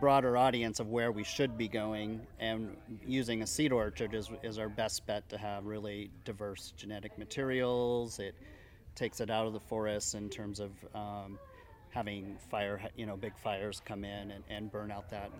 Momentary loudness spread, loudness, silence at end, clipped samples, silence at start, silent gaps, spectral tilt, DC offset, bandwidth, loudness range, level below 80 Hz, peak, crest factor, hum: 13 LU; -37 LUFS; 0 s; under 0.1%; 0 s; none; -4.5 dB/octave; under 0.1%; 17 kHz; 6 LU; -58 dBFS; -14 dBFS; 22 dB; none